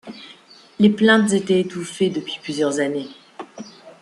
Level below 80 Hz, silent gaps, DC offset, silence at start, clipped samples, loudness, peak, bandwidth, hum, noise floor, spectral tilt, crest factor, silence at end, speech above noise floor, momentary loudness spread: -64 dBFS; none; under 0.1%; 0.05 s; under 0.1%; -19 LUFS; -2 dBFS; 11.5 kHz; none; -47 dBFS; -5 dB/octave; 18 dB; 0.1 s; 28 dB; 24 LU